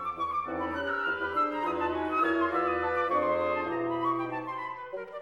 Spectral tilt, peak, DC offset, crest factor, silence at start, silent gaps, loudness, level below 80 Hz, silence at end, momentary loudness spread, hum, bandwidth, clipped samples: -6.5 dB/octave; -16 dBFS; under 0.1%; 14 dB; 0 s; none; -30 LUFS; -60 dBFS; 0 s; 8 LU; none; 11.5 kHz; under 0.1%